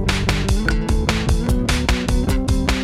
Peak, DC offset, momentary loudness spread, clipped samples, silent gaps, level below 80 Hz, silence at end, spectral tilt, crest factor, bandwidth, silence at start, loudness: -4 dBFS; under 0.1%; 1 LU; under 0.1%; none; -20 dBFS; 0 s; -5 dB/octave; 14 dB; 15 kHz; 0 s; -20 LUFS